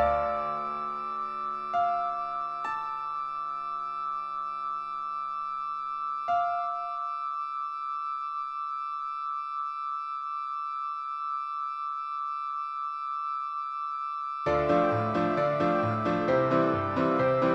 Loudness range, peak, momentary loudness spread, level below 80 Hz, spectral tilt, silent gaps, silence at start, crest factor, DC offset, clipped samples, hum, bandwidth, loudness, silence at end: 6 LU; -12 dBFS; 8 LU; -58 dBFS; -7.5 dB/octave; none; 0 s; 18 dB; under 0.1%; under 0.1%; none; 10 kHz; -30 LUFS; 0 s